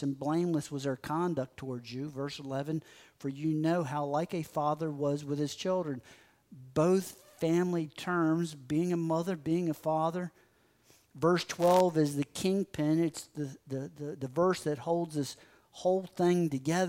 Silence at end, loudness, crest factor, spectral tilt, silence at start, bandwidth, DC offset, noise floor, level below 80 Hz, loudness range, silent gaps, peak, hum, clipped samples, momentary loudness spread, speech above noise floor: 0 s; -32 LUFS; 18 dB; -6.5 dB/octave; 0 s; 16 kHz; under 0.1%; -67 dBFS; -70 dBFS; 4 LU; none; -12 dBFS; none; under 0.1%; 11 LU; 35 dB